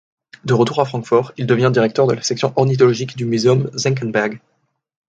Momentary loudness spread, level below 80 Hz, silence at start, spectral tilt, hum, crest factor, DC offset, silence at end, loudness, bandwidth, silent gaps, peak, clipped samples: 6 LU; -58 dBFS; 0.45 s; -6 dB/octave; none; 16 dB; under 0.1%; 0.75 s; -17 LUFS; 9 kHz; none; 0 dBFS; under 0.1%